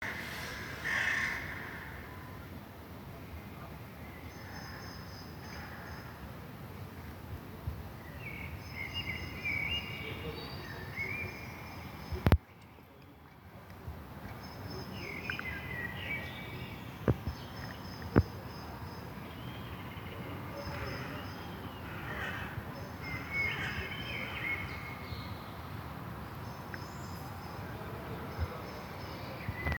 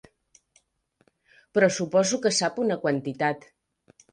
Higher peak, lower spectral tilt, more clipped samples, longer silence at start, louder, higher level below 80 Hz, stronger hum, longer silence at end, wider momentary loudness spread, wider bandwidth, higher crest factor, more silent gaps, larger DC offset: about the same, -6 dBFS vs -6 dBFS; first, -5.5 dB/octave vs -4 dB/octave; neither; second, 0 s vs 1.55 s; second, -39 LUFS vs -24 LUFS; first, -50 dBFS vs -70 dBFS; neither; second, 0 s vs 0.75 s; first, 14 LU vs 6 LU; first, over 20 kHz vs 10.5 kHz; first, 34 dB vs 20 dB; neither; neither